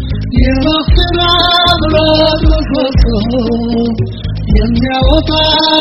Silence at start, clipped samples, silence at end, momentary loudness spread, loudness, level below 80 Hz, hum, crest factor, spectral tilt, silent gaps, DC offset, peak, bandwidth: 0 s; 0.2%; 0 s; 6 LU; -10 LUFS; -16 dBFS; none; 10 dB; -7 dB/octave; none; under 0.1%; 0 dBFS; 6.2 kHz